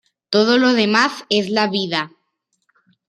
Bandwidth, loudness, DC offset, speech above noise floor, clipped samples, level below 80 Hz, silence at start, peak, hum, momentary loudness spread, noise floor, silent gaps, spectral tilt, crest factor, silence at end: 11.5 kHz; -17 LUFS; under 0.1%; 54 dB; under 0.1%; -68 dBFS; 0.3 s; -2 dBFS; none; 8 LU; -71 dBFS; none; -4.5 dB/octave; 18 dB; 1 s